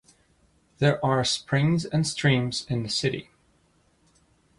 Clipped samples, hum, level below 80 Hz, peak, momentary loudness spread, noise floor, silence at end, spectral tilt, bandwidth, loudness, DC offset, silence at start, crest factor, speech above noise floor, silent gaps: under 0.1%; none; -56 dBFS; -10 dBFS; 6 LU; -64 dBFS; 1.35 s; -5 dB/octave; 11.5 kHz; -25 LUFS; under 0.1%; 0.8 s; 18 dB; 40 dB; none